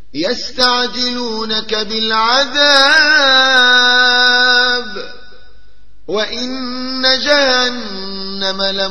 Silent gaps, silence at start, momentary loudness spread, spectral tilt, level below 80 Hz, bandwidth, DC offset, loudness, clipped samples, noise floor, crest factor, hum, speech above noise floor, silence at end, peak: none; 0.15 s; 14 LU; -1.5 dB/octave; -46 dBFS; 11 kHz; 4%; -11 LUFS; under 0.1%; -48 dBFS; 14 dB; none; 35 dB; 0 s; 0 dBFS